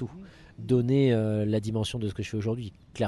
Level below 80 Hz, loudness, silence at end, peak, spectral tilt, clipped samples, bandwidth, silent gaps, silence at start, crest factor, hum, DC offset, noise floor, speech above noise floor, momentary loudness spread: -52 dBFS; -27 LUFS; 0 s; -12 dBFS; -7.5 dB/octave; under 0.1%; 12 kHz; none; 0 s; 16 dB; none; under 0.1%; -47 dBFS; 21 dB; 17 LU